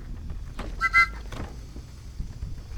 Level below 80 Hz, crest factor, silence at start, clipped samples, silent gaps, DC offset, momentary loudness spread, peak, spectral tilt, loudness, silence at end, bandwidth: -38 dBFS; 22 dB; 0 s; under 0.1%; none; under 0.1%; 23 LU; -8 dBFS; -4 dB/octave; -22 LUFS; 0 s; 18 kHz